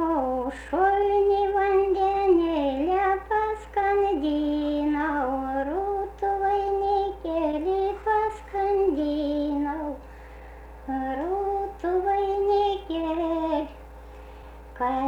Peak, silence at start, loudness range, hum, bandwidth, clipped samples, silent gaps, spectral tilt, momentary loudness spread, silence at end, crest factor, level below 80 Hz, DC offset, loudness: -12 dBFS; 0 s; 5 LU; none; 8.6 kHz; under 0.1%; none; -7 dB/octave; 17 LU; 0 s; 14 dB; -44 dBFS; under 0.1%; -25 LUFS